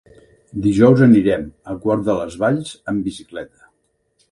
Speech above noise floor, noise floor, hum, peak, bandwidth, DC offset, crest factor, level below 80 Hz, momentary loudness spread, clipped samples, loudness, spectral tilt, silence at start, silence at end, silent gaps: 50 dB; -66 dBFS; none; 0 dBFS; 11.5 kHz; under 0.1%; 18 dB; -46 dBFS; 20 LU; under 0.1%; -17 LUFS; -8 dB/octave; 0.55 s; 0.85 s; none